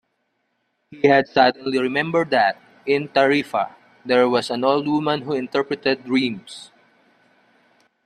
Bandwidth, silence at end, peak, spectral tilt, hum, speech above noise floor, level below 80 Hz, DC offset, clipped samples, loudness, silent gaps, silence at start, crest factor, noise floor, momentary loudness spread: 12 kHz; 1.4 s; -2 dBFS; -5.5 dB/octave; none; 52 dB; -66 dBFS; under 0.1%; under 0.1%; -20 LUFS; none; 0.9 s; 20 dB; -71 dBFS; 10 LU